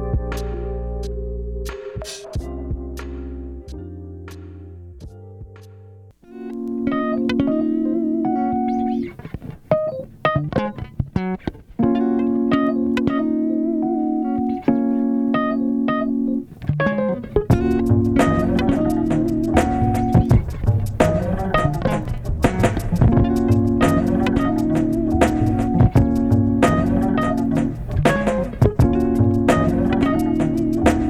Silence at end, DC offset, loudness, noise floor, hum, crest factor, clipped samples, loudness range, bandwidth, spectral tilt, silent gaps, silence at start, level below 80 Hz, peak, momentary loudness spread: 0 s; under 0.1%; -20 LUFS; -44 dBFS; none; 18 dB; under 0.1%; 13 LU; 14 kHz; -8 dB/octave; none; 0 s; -30 dBFS; 0 dBFS; 14 LU